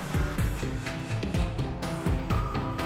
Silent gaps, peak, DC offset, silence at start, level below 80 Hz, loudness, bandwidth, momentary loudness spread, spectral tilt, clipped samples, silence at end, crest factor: none; -16 dBFS; under 0.1%; 0 s; -34 dBFS; -31 LUFS; 16 kHz; 4 LU; -6 dB/octave; under 0.1%; 0 s; 14 dB